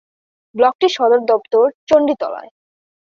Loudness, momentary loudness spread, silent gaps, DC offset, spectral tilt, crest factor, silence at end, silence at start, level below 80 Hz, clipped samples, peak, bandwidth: -15 LUFS; 12 LU; 0.75-0.79 s, 1.74-1.87 s; under 0.1%; -4 dB/octave; 14 dB; 0.65 s; 0.55 s; -60 dBFS; under 0.1%; -2 dBFS; 7.2 kHz